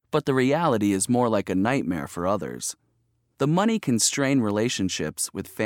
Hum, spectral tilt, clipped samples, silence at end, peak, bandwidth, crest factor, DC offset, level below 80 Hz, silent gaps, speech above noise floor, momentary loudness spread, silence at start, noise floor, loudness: none; -4.5 dB/octave; under 0.1%; 0 s; -8 dBFS; 18 kHz; 16 dB; under 0.1%; -58 dBFS; none; 46 dB; 8 LU; 0.15 s; -70 dBFS; -24 LUFS